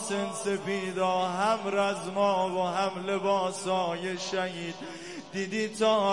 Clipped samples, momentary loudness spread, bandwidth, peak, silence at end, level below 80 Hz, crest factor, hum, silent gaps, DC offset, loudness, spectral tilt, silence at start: under 0.1%; 9 LU; 11.5 kHz; -12 dBFS; 0 s; -72 dBFS; 16 dB; 50 Hz at -60 dBFS; none; 0.1%; -29 LUFS; -4 dB/octave; 0 s